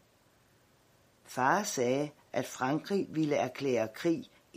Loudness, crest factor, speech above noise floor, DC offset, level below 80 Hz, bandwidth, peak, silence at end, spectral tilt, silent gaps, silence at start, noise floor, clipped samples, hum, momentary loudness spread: -32 LUFS; 20 dB; 35 dB; under 0.1%; -76 dBFS; 15.5 kHz; -12 dBFS; 0.3 s; -5 dB/octave; none; 1.3 s; -66 dBFS; under 0.1%; none; 8 LU